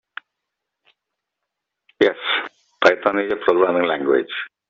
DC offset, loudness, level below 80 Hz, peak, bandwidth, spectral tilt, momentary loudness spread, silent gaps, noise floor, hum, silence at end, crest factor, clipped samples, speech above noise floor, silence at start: under 0.1%; -19 LUFS; -62 dBFS; -2 dBFS; 7.6 kHz; -1 dB/octave; 14 LU; none; -81 dBFS; none; 0.25 s; 20 dB; under 0.1%; 62 dB; 2 s